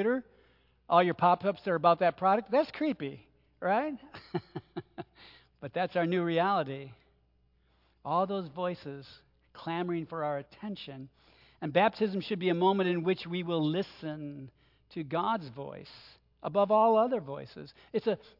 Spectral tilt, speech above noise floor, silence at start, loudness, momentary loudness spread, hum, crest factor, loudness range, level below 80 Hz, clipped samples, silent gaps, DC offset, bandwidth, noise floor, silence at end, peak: -8.5 dB/octave; 39 dB; 0 s; -30 LUFS; 19 LU; none; 22 dB; 8 LU; -70 dBFS; under 0.1%; none; under 0.1%; 5.8 kHz; -69 dBFS; 0.25 s; -10 dBFS